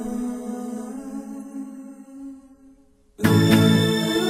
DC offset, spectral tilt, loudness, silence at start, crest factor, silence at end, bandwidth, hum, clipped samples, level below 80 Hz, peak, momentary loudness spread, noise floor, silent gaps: under 0.1%; -6 dB/octave; -20 LUFS; 0 s; 20 dB; 0 s; 16 kHz; none; under 0.1%; -54 dBFS; -4 dBFS; 24 LU; -54 dBFS; none